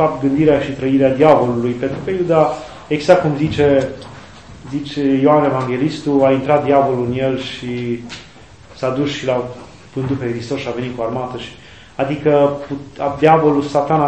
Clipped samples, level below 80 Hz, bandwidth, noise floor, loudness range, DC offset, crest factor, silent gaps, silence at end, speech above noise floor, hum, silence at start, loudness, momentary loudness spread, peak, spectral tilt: under 0.1%; -46 dBFS; 8.6 kHz; -41 dBFS; 7 LU; 0.3%; 16 dB; none; 0 s; 26 dB; none; 0 s; -16 LUFS; 14 LU; 0 dBFS; -7 dB/octave